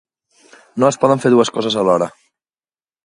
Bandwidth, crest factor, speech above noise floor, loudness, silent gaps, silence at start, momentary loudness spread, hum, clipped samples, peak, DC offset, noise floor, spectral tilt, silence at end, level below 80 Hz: 11.5 kHz; 18 dB; over 76 dB; -15 LUFS; none; 0.75 s; 8 LU; none; under 0.1%; 0 dBFS; under 0.1%; under -90 dBFS; -5 dB/octave; 0.95 s; -62 dBFS